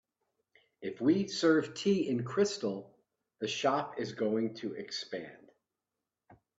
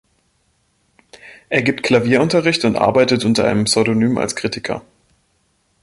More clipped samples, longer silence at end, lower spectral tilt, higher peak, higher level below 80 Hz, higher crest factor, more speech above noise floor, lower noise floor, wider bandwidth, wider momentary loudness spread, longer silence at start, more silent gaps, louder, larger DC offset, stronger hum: neither; second, 0.25 s vs 1.05 s; about the same, -5 dB/octave vs -4.5 dB/octave; second, -14 dBFS vs -2 dBFS; second, -76 dBFS vs -50 dBFS; about the same, 20 dB vs 16 dB; first, 58 dB vs 47 dB; first, -89 dBFS vs -63 dBFS; second, 8 kHz vs 11.5 kHz; first, 14 LU vs 8 LU; second, 0.8 s vs 1.25 s; neither; second, -32 LUFS vs -16 LUFS; neither; neither